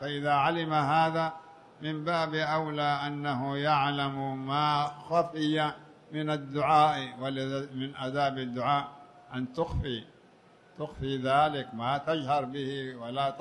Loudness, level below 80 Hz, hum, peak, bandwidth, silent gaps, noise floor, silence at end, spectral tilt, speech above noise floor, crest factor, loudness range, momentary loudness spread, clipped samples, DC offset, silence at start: -30 LUFS; -54 dBFS; none; -12 dBFS; 10.5 kHz; none; -59 dBFS; 0 s; -6.5 dB/octave; 29 dB; 18 dB; 4 LU; 11 LU; under 0.1%; under 0.1%; 0 s